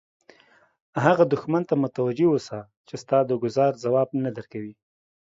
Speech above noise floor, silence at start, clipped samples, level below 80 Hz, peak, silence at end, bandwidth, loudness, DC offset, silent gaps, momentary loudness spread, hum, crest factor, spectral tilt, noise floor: 35 dB; 0.95 s; under 0.1%; -68 dBFS; -2 dBFS; 0.5 s; 7.8 kHz; -23 LUFS; under 0.1%; 2.77-2.84 s; 16 LU; none; 22 dB; -7.5 dB/octave; -58 dBFS